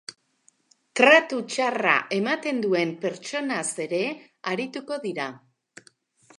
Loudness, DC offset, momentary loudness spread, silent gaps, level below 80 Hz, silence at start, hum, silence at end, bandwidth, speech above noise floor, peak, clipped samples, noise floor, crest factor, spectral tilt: -24 LUFS; under 0.1%; 15 LU; none; -82 dBFS; 0.1 s; none; 1.05 s; 11.5 kHz; 40 dB; -2 dBFS; under 0.1%; -64 dBFS; 24 dB; -3.5 dB/octave